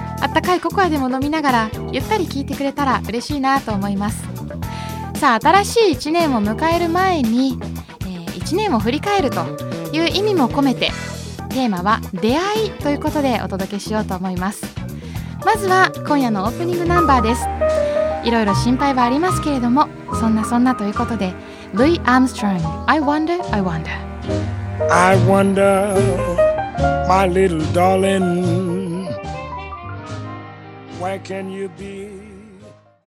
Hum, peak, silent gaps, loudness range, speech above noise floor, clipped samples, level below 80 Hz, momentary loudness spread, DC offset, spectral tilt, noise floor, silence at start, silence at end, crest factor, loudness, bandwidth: none; 0 dBFS; none; 5 LU; 27 dB; under 0.1%; -38 dBFS; 14 LU; under 0.1%; -5.5 dB/octave; -44 dBFS; 0 s; 0.35 s; 18 dB; -18 LUFS; 16.5 kHz